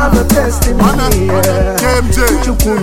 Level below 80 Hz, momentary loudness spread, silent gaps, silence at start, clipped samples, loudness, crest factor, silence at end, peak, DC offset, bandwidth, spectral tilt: -16 dBFS; 2 LU; none; 0 s; 0.5%; -11 LUFS; 10 dB; 0 s; 0 dBFS; under 0.1%; over 20 kHz; -5 dB/octave